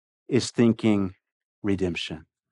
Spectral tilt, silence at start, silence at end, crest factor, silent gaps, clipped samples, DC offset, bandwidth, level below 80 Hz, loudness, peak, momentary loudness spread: -6 dB/octave; 0.3 s; 0.3 s; 18 dB; 1.32-1.62 s; under 0.1%; under 0.1%; 11 kHz; -58 dBFS; -25 LUFS; -8 dBFS; 12 LU